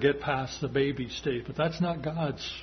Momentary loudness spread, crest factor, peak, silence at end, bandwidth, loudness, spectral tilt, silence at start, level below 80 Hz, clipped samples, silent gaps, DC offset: 4 LU; 18 dB; -10 dBFS; 0 s; 6.4 kHz; -30 LUFS; -6 dB/octave; 0 s; -52 dBFS; under 0.1%; none; under 0.1%